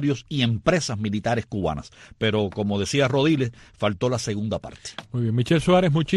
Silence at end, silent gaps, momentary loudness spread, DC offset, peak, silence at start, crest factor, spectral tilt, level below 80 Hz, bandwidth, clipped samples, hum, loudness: 0 s; none; 11 LU; under 0.1%; -4 dBFS; 0 s; 18 dB; -6 dB/octave; -48 dBFS; 12 kHz; under 0.1%; none; -23 LUFS